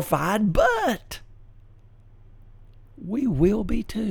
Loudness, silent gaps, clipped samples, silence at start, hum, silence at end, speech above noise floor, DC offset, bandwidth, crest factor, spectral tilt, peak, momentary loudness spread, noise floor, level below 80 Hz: -23 LUFS; none; under 0.1%; 0 s; none; 0 s; 27 dB; under 0.1%; over 20 kHz; 18 dB; -6 dB/octave; -6 dBFS; 18 LU; -50 dBFS; -38 dBFS